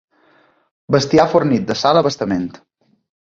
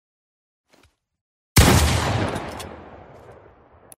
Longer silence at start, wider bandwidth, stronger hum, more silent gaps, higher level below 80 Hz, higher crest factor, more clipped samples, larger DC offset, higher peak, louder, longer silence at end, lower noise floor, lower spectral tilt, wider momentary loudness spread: second, 0.9 s vs 1.55 s; second, 7.8 kHz vs 16 kHz; neither; neither; second, -50 dBFS vs -32 dBFS; second, 16 dB vs 22 dB; neither; neither; about the same, -2 dBFS vs 0 dBFS; first, -16 LUFS vs -19 LUFS; about the same, 0.75 s vs 0.7 s; second, -55 dBFS vs -60 dBFS; about the same, -5.5 dB/octave vs -4.5 dB/octave; second, 8 LU vs 22 LU